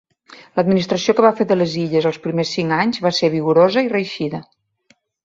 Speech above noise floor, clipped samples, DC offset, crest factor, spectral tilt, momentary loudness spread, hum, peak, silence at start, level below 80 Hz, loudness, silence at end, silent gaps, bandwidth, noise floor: 42 dB; under 0.1%; under 0.1%; 16 dB; -6 dB/octave; 9 LU; none; -2 dBFS; 0.3 s; -60 dBFS; -17 LUFS; 0.8 s; none; 7.8 kHz; -59 dBFS